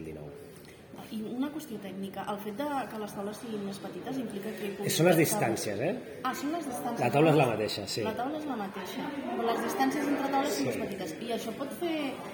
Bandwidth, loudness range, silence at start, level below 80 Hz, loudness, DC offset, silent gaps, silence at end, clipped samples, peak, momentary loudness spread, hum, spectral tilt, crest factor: over 20 kHz; 9 LU; 0 s; -70 dBFS; -31 LUFS; under 0.1%; none; 0 s; under 0.1%; -12 dBFS; 14 LU; none; -5 dB/octave; 20 dB